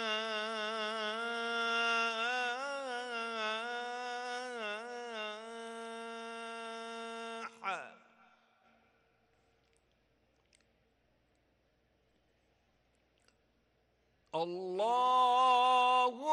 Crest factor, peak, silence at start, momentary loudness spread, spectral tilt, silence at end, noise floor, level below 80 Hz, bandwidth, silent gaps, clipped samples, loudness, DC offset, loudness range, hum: 18 dB; -20 dBFS; 0 s; 16 LU; -2 dB/octave; 0 s; -75 dBFS; -84 dBFS; 11.5 kHz; none; under 0.1%; -35 LUFS; under 0.1%; 14 LU; none